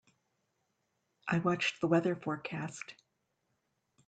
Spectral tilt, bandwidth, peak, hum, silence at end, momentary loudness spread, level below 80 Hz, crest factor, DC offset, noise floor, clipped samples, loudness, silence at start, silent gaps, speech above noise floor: -6 dB/octave; 9 kHz; -16 dBFS; none; 1.15 s; 15 LU; -76 dBFS; 20 dB; under 0.1%; -81 dBFS; under 0.1%; -33 LUFS; 1.25 s; none; 48 dB